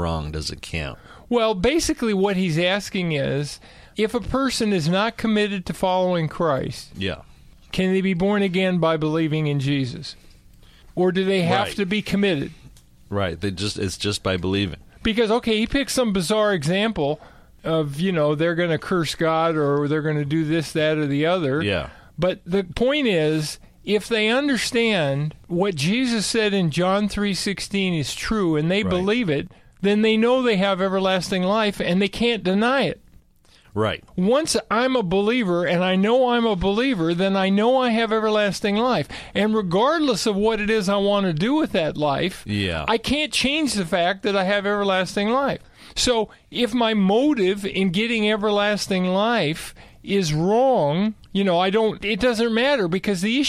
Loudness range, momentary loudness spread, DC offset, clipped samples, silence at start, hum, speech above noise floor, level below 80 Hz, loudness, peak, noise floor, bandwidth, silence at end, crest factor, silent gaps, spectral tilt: 3 LU; 7 LU; under 0.1%; under 0.1%; 0 s; none; 33 dB; -46 dBFS; -21 LUFS; -6 dBFS; -54 dBFS; 14.5 kHz; 0 s; 14 dB; none; -5 dB/octave